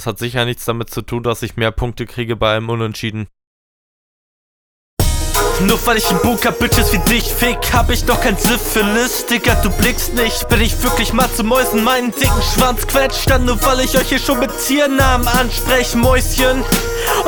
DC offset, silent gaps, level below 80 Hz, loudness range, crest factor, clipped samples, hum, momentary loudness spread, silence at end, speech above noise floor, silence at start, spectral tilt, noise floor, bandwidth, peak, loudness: under 0.1%; 3.47-4.97 s; -22 dBFS; 7 LU; 14 dB; under 0.1%; none; 7 LU; 0 s; over 76 dB; 0 s; -4 dB/octave; under -90 dBFS; over 20 kHz; 0 dBFS; -15 LUFS